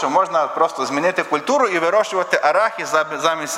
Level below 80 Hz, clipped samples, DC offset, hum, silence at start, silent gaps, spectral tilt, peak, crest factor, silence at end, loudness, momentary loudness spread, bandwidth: -72 dBFS; under 0.1%; under 0.1%; none; 0 s; none; -3 dB/octave; 0 dBFS; 18 dB; 0 s; -18 LUFS; 3 LU; 16 kHz